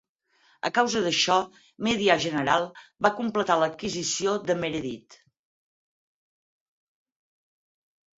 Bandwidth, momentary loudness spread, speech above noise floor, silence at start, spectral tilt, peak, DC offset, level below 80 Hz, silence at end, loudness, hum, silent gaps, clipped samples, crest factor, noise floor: 8 kHz; 11 LU; 40 dB; 0.65 s; -3 dB/octave; -4 dBFS; under 0.1%; -64 dBFS; 3.05 s; -25 LUFS; none; none; under 0.1%; 24 dB; -65 dBFS